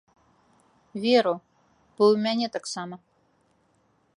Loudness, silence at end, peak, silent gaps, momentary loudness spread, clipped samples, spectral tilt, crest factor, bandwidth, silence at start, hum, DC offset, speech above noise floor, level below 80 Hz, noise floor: -24 LUFS; 1.2 s; -8 dBFS; none; 18 LU; under 0.1%; -4.5 dB/octave; 20 dB; 11 kHz; 0.95 s; none; under 0.1%; 43 dB; -74 dBFS; -67 dBFS